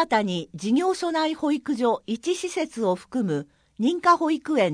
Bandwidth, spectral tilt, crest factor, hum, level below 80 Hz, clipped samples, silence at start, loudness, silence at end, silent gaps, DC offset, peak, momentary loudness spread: 10.5 kHz; -5 dB/octave; 18 dB; none; -66 dBFS; under 0.1%; 0 s; -24 LUFS; 0 s; none; under 0.1%; -6 dBFS; 8 LU